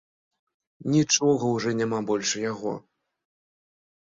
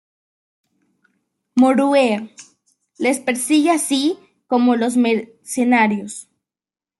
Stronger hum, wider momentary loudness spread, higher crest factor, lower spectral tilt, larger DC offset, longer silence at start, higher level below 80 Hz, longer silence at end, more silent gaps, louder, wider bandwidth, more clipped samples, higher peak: neither; about the same, 12 LU vs 12 LU; about the same, 20 dB vs 16 dB; about the same, -4 dB/octave vs -3.5 dB/octave; neither; second, 0.8 s vs 1.55 s; about the same, -66 dBFS vs -70 dBFS; first, 1.25 s vs 0.8 s; neither; second, -25 LUFS vs -17 LUFS; second, 7.8 kHz vs 12.5 kHz; neither; second, -8 dBFS vs -4 dBFS